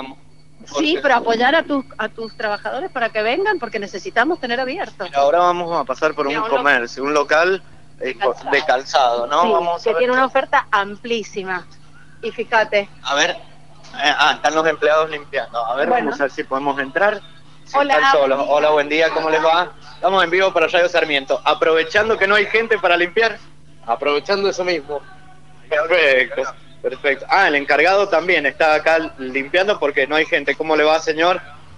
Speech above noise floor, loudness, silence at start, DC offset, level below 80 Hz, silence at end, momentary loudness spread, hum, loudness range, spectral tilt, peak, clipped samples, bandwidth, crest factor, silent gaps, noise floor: 29 dB; -17 LUFS; 0 s; 1%; -56 dBFS; 0.25 s; 11 LU; none; 4 LU; -3 dB/octave; 0 dBFS; under 0.1%; 11 kHz; 18 dB; none; -47 dBFS